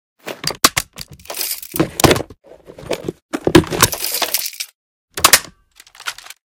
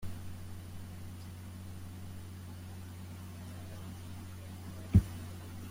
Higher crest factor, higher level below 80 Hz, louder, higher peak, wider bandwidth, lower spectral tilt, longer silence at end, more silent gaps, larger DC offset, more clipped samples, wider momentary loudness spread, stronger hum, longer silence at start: second, 18 dB vs 28 dB; first, -40 dBFS vs -48 dBFS; first, -16 LUFS vs -40 LUFS; first, 0 dBFS vs -12 dBFS; first, over 20 kHz vs 16.5 kHz; second, -2.5 dB/octave vs -7 dB/octave; first, 0.4 s vs 0 s; first, 3.22-3.29 s, 4.75-5.08 s vs none; neither; first, 0.3% vs under 0.1%; about the same, 19 LU vs 17 LU; neither; first, 0.25 s vs 0 s